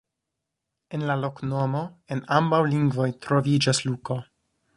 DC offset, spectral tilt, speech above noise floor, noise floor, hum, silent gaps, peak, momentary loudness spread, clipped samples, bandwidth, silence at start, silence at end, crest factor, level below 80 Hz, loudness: under 0.1%; -5.5 dB/octave; 59 dB; -83 dBFS; none; none; -4 dBFS; 11 LU; under 0.1%; 11.5 kHz; 0.9 s; 0.55 s; 20 dB; -62 dBFS; -25 LUFS